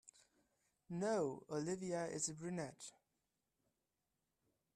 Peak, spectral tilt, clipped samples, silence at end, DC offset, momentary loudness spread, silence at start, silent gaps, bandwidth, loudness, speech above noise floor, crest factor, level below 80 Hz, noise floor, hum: -28 dBFS; -4.5 dB/octave; under 0.1%; 1.85 s; under 0.1%; 11 LU; 0.05 s; none; 13.5 kHz; -43 LUFS; 46 dB; 18 dB; -82 dBFS; -89 dBFS; none